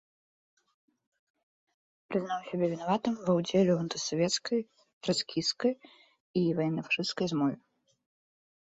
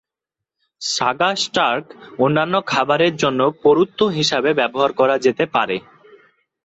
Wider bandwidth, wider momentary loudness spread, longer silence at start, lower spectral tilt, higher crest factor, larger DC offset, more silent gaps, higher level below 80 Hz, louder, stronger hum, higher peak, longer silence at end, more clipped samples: about the same, 8 kHz vs 8.2 kHz; about the same, 8 LU vs 7 LU; first, 2.1 s vs 0.8 s; about the same, -5 dB/octave vs -4 dB/octave; about the same, 18 dB vs 16 dB; neither; first, 4.93-5.01 s, 6.20-6.34 s vs none; second, -72 dBFS vs -60 dBFS; second, -31 LUFS vs -18 LUFS; neither; second, -14 dBFS vs -2 dBFS; first, 1.1 s vs 0.85 s; neither